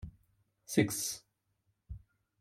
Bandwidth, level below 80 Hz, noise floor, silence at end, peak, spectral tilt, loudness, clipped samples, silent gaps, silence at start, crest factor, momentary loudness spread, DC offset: 16.5 kHz; -58 dBFS; -79 dBFS; 0.4 s; -12 dBFS; -4 dB/octave; -33 LUFS; under 0.1%; none; 0 s; 26 dB; 22 LU; under 0.1%